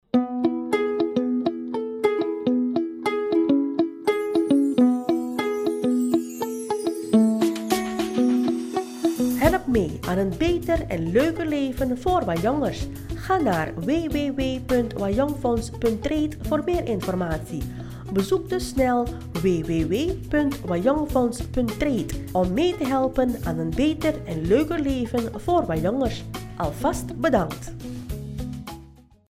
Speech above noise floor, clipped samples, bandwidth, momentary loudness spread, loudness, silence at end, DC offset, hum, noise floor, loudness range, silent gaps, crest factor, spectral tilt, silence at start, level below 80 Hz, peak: 25 dB; under 0.1%; 16 kHz; 8 LU; -24 LUFS; 0.4 s; under 0.1%; none; -48 dBFS; 3 LU; none; 18 dB; -6.5 dB/octave; 0.15 s; -40 dBFS; -4 dBFS